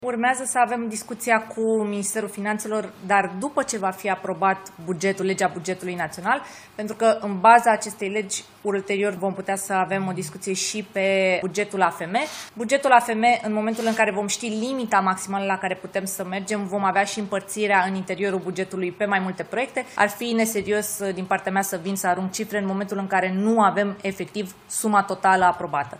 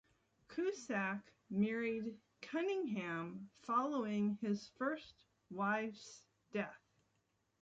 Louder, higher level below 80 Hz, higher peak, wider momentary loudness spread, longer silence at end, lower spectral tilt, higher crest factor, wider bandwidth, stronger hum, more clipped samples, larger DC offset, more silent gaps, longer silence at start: first, -23 LUFS vs -41 LUFS; first, -68 dBFS vs -80 dBFS; first, -2 dBFS vs -24 dBFS; second, 9 LU vs 13 LU; second, 0 s vs 0.85 s; second, -4 dB/octave vs -6 dB/octave; first, 22 dB vs 16 dB; first, 16 kHz vs 7.8 kHz; neither; neither; neither; neither; second, 0 s vs 0.5 s